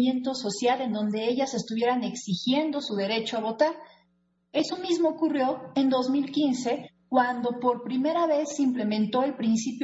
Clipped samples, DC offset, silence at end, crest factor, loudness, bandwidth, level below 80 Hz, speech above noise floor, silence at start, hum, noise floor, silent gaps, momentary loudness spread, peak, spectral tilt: under 0.1%; under 0.1%; 0 s; 16 dB; -27 LUFS; 8 kHz; -72 dBFS; 44 dB; 0 s; none; -70 dBFS; none; 4 LU; -10 dBFS; -4.5 dB/octave